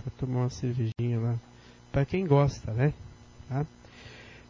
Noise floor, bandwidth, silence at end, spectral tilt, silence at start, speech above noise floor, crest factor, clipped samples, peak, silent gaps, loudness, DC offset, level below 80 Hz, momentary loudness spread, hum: -49 dBFS; 7.4 kHz; 0.1 s; -8 dB/octave; 0 s; 21 dB; 20 dB; under 0.1%; -10 dBFS; none; -29 LUFS; under 0.1%; -50 dBFS; 23 LU; none